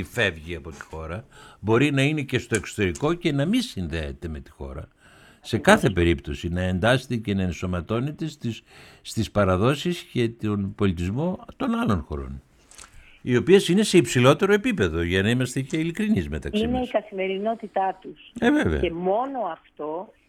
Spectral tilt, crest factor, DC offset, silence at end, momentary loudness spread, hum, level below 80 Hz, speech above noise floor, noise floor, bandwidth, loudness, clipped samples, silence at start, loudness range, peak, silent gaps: -6 dB/octave; 24 dB; under 0.1%; 0.25 s; 17 LU; none; -42 dBFS; 25 dB; -48 dBFS; 15.5 kHz; -23 LUFS; under 0.1%; 0 s; 6 LU; 0 dBFS; none